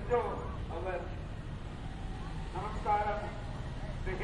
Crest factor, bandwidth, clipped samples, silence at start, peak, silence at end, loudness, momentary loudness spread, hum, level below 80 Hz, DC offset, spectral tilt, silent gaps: 18 dB; 11 kHz; under 0.1%; 0 s; -18 dBFS; 0 s; -38 LUFS; 11 LU; none; -42 dBFS; under 0.1%; -7 dB/octave; none